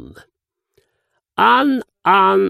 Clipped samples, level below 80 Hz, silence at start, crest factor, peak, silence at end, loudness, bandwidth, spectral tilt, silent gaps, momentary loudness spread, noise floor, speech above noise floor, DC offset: under 0.1%; -58 dBFS; 1.4 s; 16 dB; 0 dBFS; 0 s; -14 LUFS; 15 kHz; -6 dB/octave; none; 7 LU; -71 dBFS; 56 dB; under 0.1%